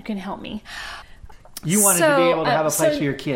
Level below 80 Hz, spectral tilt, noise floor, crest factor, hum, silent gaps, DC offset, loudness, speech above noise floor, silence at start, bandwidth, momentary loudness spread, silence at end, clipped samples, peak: -48 dBFS; -3.5 dB/octave; -41 dBFS; 18 dB; none; none; under 0.1%; -18 LUFS; 21 dB; 0.05 s; 17 kHz; 19 LU; 0 s; under 0.1%; -4 dBFS